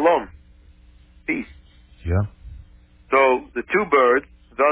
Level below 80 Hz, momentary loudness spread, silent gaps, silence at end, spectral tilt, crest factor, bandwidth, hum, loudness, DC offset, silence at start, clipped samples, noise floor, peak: -40 dBFS; 19 LU; none; 0 s; -10 dB/octave; 18 dB; 4 kHz; none; -20 LUFS; under 0.1%; 0 s; under 0.1%; -50 dBFS; -4 dBFS